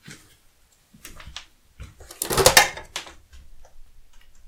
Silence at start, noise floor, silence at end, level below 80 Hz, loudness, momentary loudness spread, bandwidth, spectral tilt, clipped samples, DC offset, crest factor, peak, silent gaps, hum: 0.1 s; -58 dBFS; 0.65 s; -44 dBFS; -18 LUFS; 28 LU; 18 kHz; -1.5 dB/octave; under 0.1%; under 0.1%; 26 dB; 0 dBFS; none; none